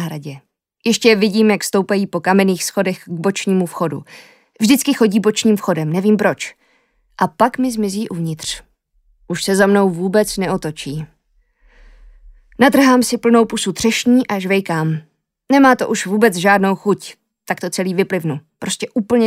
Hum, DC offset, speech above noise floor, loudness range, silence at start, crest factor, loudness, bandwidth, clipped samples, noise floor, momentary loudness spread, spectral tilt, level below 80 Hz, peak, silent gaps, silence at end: none; under 0.1%; 44 dB; 4 LU; 0 s; 16 dB; -16 LUFS; 16 kHz; under 0.1%; -59 dBFS; 13 LU; -5 dB/octave; -52 dBFS; 0 dBFS; none; 0 s